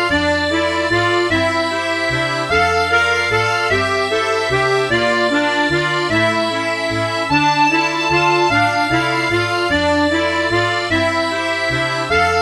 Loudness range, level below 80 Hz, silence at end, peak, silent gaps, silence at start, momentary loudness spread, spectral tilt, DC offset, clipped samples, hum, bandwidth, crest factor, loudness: 1 LU; -42 dBFS; 0 s; -2 dBFS; none; 0 s; 4 LU; -4.5 dB/octave; 0.1%; under 0.1%; none; 13 kHz; 14 dB; -15 LUFS